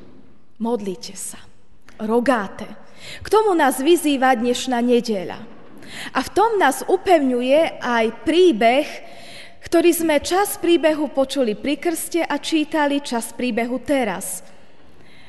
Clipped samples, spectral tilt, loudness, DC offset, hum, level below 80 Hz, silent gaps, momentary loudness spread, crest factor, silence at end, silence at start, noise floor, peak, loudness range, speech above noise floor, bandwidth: under 0.1%; -3.5 dB/octave; -19 LUFS; 1%; none; -54 dBFS; none; 16 LU; 16 dB; 0.9 s; 0.6 s; -51 dBFS; -2 dBFS; 4 LU; 32 dB; 12.5 kHz